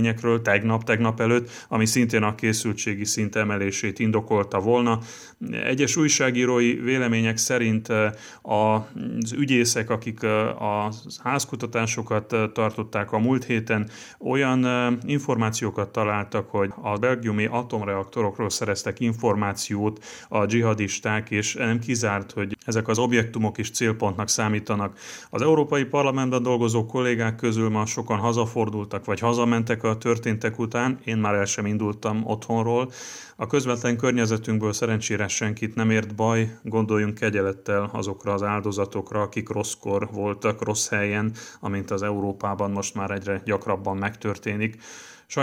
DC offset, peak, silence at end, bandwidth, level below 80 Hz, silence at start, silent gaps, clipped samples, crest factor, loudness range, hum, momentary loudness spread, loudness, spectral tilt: under 0.1%; -4 dBFS; 0 s; 16.5 kHz; -66 dBFS; 0 s; none; under 0.1%; 20 dB; 4 LU; none; 7 LU; -24 LUFS; -5 dB/octave